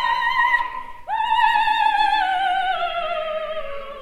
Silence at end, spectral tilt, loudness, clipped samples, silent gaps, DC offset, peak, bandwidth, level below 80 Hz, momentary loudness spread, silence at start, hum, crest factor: 0 s; -1.5 dB/octave; -20 LUFS; under 0.1%; none; under 0.1%; -4 dBFS; 14 kHz; -46 dBFS; 12 LU; 0 s; none; 16 dB